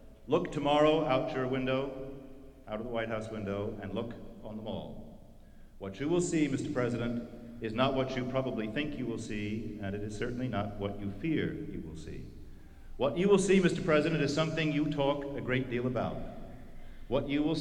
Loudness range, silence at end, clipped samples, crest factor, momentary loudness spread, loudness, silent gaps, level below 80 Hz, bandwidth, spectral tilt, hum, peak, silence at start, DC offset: 8 LU; 0 s; under 0.1%; 20 dB; 19 LU; -32 LUFS; none; -50 dBFS; 11.5 kHz; -6 dB/octave; none; -14 dBFS; 0 s; under 0.1%